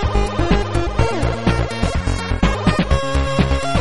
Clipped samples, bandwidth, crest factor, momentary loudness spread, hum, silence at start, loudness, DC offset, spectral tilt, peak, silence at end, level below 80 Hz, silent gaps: under 0.1%; 11.5 kHz; 16 dB; 3 LU; none; 0 s; -19 LUFS; 3%; -6 dB/octave; -2 dBFS; 0 s; -22 dBFS; none